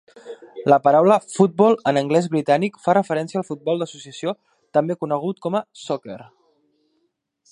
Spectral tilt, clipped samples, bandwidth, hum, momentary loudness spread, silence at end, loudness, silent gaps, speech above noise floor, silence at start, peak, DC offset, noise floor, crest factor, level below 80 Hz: -6.5 dB/octave; under 0.1%; 11 kHz; none; 15 LU; 1.3 s; -20 LUFS; none; 51 dB; 0.25 s; -2 dBFS; under 0.1%; -71 dBFS; 20 dB; -70 dBFS